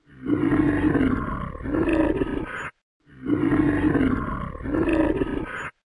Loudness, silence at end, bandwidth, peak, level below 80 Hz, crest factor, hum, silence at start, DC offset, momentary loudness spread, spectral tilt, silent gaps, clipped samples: -24 LUFS; 0.3 s; 11 kHz; -8 dBFS; -38 dBFS; 16 dB; none; 0.15 s; under 0.1%; 11 LU; -8.5 dB/octave; 2.83-3.00 s; under 0.1%